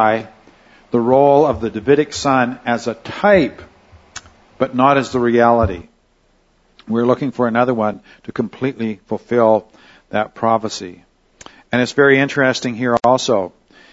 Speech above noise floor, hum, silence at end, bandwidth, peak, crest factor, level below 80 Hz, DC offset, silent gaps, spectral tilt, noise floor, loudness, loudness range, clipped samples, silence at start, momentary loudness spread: 42 dB; none; 0.45 s; 8 kHz; 0 dBFS; 16 dB; -46 dBFS; under 0.1%; none; -5.5 dB/octave; -57 dBFS; -16 LUFS; 4 LU; under 0.1%; 0 s; 13 LU